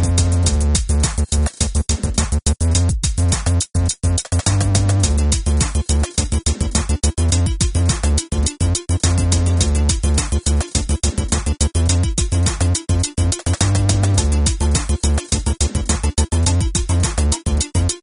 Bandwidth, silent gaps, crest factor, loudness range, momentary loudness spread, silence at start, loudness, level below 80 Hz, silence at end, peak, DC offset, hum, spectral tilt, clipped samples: 11 kHz; none; 16 dB; 1 LU; 3 LU; 0 s; -18 LUFS; -20 dBFS; 0.05 s; -2 dBFS; 0.1%; none; -4.5 dB/octave; under 0.1%